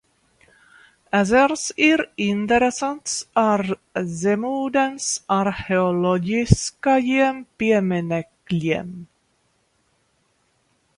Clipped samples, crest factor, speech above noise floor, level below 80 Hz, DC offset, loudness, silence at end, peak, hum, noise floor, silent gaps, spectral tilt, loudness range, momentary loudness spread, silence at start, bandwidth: under 0.1%; 22 dB; 46 dB; -44 dBFS; under 0.1%; -21 LUFS; 1.95 s; 0 dBFS; none; -66 dBFS; none; -5 dB/octave; 4 LU; 9 LU; 1.15 s; 11.5 kHz